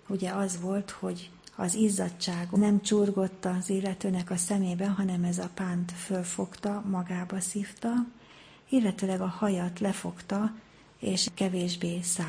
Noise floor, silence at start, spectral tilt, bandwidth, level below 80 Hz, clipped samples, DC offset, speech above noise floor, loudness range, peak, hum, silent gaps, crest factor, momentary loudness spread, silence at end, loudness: -54 dBFS; 0.05 s; -5 dB/octave; 10.5 kHz; -66 dBFS; under 0.1%; under 0.1%; 24 dB; 4 LU; -14 dBFS; none; none; 16 dB; 8 LU; 0 s; -30 LUFS